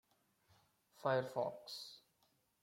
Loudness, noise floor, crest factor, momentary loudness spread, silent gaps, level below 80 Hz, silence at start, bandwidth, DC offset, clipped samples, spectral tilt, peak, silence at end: -42 LUFS; -79 dBFS; 22 dB; 15 LU; none; -88 dBFS; 1 s; 16.5 kHz; under 0.1%; under 0.1%; -5 dB/octave; -22 dBFS; 0.65 s